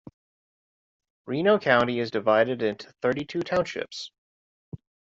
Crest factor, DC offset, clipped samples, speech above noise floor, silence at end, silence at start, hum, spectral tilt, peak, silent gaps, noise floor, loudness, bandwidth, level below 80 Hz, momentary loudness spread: 22 dB; under 0.1%; under 0.1%; over 65 dB; 0.4 s; 1.25 s; none; -5.5 dB/octave; -6 dBFS; 4.18-4.72 s; under -90 dBFS; -25 LUFS; 7.8 kHz; -64 dBFS; 22 LU